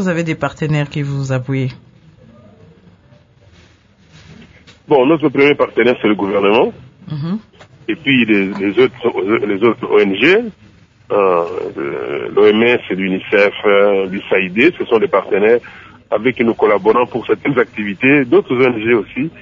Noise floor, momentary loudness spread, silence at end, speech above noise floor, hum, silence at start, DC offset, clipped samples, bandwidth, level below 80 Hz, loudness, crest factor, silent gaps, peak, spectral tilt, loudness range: -48 dBFS; 10 LU; 0 s; 34 dB; none; 0 s; under 0.1%; under 0.1%; 7.6 kHz; -52 dBFS; -14 LUFS; 14 dB; none; 0 dBFS; -7 dB/octave; 8 LU